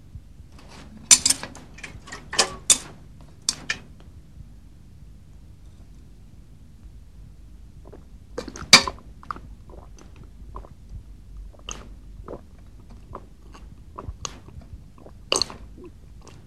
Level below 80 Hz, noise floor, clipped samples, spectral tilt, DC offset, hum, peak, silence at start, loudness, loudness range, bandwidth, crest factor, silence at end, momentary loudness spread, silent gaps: -46 dBFS; -47 dBFS; under 0.1%; -0.5 dB/octave; 0.3%; none; 0 dBFS; 0.15 s; -19 LUFS; 21 LU; 19 kHz; 28 dB; 0.25 s; 31 LU; none